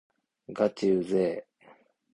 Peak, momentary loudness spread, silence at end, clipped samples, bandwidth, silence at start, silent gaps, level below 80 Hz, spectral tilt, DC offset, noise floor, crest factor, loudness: -12 dBFS; 14 LU; 0.75 s; under 0.1%; 11 kHz; 0.5 s; none; -70 dBFS; -7 dB/octave; under 0.1%; -59 dBFS; 18 dB; -28 LUFS